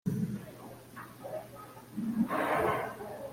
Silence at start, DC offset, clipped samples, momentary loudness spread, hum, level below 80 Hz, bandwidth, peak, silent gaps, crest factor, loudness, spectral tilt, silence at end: 0.05 s; under 0.1%; under 0.1%; 18 LU; none; -64 dBFS; 16.5 kHz; -16 dBFS; none; 20 dB; -34 LUFS; -6.5 dB/octave; 0 s